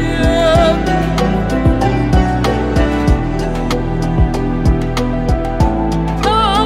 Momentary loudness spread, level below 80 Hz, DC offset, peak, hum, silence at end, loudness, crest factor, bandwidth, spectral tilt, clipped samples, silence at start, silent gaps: 5 LU; -18 dBFS; under 0.1%; 0 dBFS; none; 0 s; -15 LUFS; 12 dB; 13.5 kHz; -6.5 dB/octave; under 0.1%; 0 s; none